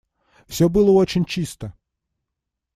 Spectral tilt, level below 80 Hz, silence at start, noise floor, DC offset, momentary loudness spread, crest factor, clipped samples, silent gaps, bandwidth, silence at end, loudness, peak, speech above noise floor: -6.5 dB/octave; -44 dBFS; 0.5 s; -82 dBFS; under 0.1%; 19 LU; 16 dB; under 0.1%; none; 15.5 kHz; 1.05 s; -19 LUFS; -6 dBFS; 64 dB